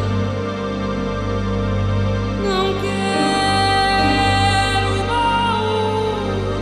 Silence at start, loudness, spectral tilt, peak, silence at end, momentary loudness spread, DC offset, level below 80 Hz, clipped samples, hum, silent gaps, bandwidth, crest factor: 0 s; -18 LUFS; -5.5 dB/octave; -4 dBFS; 0 s; 7 LU; under 0.1%; -32 dBFS; under 0.1%; 50 Hz at -35 dBFS; none; 11.5 kHz; 14 dB